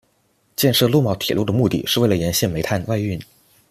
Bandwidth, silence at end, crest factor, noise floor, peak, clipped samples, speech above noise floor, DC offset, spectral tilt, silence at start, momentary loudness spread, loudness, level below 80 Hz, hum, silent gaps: 15 kHz; 0.45 s; 16 dB; -63 dBFS; -2 dBFS; under 0.1%; 44 dB; under 0.1%; -5 dB/octave; 0.6 s; 8 LU; -19 LUFS; -48 dBFS; none; none